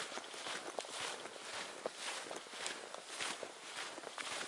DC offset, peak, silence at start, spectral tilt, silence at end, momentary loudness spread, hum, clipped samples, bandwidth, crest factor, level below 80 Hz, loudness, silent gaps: under 0.1%; -22 dBFS; 0 s; 0 dB/octave; 0 s; 4 LU; none; under 0.1%; 11.5 kHz; 24 dB; -90 dBFS; -44 LUFS; none